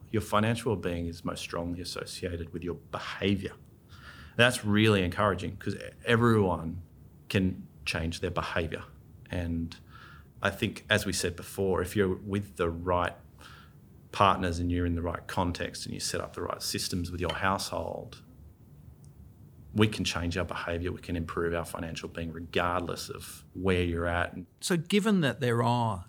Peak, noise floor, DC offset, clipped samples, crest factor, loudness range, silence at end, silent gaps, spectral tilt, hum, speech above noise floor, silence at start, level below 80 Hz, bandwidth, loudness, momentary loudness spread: -6 dBFS; -54 dBFS; under 0.1%; under 0.1%; 24 dB; 6 LU; 0.05 s; none; -5 dB/octave; none; 24 dB; 0 s; -50 dBFS; over 20 kHz; -30 LUFS; 14 LU